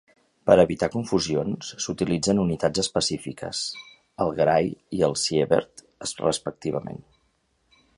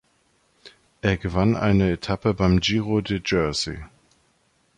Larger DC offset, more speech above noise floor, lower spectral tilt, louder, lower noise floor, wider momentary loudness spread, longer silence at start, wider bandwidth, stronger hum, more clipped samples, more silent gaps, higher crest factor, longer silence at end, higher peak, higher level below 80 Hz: neither; about the same, 45 dB vs 43 dB; second, -4.5 dB/octave vs -6 dB/octave; about the same, -24 LUFS vs -22 LUFS; first, -69 dBFS vs -65 dBFS; first, 12 LU vs 7 LU; second, 0.45 s vs 0.65 s; about the same, 11.5 kHz vs 10.5 kHz; neither; neither; neither; first, 24 dB vs 18 dB; about the same, 1 s vs 0.9 s; about the same, -2 dBFS vs -4 dBFS; second, -52 dBFS vs -40 dBFS